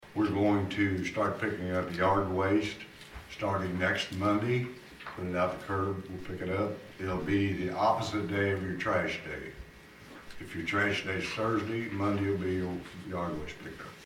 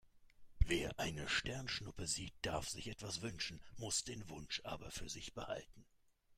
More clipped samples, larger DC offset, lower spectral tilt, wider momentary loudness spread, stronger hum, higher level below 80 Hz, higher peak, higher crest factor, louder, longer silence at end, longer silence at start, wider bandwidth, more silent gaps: neither; neither; first, -6.5 dB/octave vs -3 dB/octave; first, 16 LU vs 9 LU; neither; about the same, -56 dBFS vs -52 dBFS; first, -14 dBFS vs -18 dBFS; second, 18 dB vs 26 dB; first, -31 LUFS vs -43 LUFS; about the same, 0 s vs 0.05 s; about the same, 0 s vs 0.05 s; about the same, 16 kHz vs 16 kHz; neither